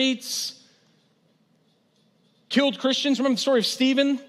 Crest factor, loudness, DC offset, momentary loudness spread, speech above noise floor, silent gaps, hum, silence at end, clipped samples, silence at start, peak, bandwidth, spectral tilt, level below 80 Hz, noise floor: 18 dB; -23 LUFS; under 0.1%; 7 LU; 42 dB; none; none; 0.05 s; under 0.1%; 0 s; -8 dBFS; 14.5 kHz; -3 dB/octave; -88 dBFS; -65 dBFS